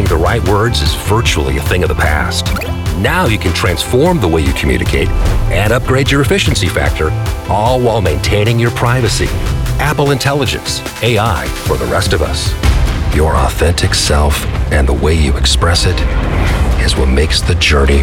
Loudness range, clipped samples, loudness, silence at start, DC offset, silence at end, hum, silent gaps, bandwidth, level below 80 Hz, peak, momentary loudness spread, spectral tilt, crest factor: 2 LU; under 0.1%; -13 LUFS; 0 s; under 0.1%; 0 s; none; none; 17 kHz; -16 dBFS; 0 dBFS; 5 LU; -5 dB/octave; 12 dB